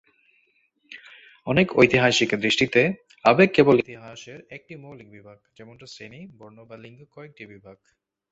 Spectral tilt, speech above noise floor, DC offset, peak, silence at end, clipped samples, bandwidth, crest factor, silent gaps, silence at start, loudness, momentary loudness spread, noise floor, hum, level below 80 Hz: -5 dB/octave; 43 dB; under 0.1%; -2 dBFS; 0.6 s; under 0.1%; 8 kHz; 24 dB; none; 0.9 s; -19 LUFS; 26 LU; -66 dBFS; none; -58 dBFS